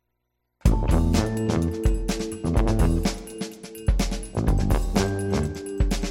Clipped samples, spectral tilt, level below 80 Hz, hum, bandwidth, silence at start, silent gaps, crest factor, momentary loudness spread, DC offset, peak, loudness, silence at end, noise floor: under 0.1%; -6 dB/octave; -26 dBFS; none; 16 kHz; 0.65 s; none; 18 dB; 8 LU; under 0.1%; -6 dBFS; -25 LUFS; 0 s; -77 dBFS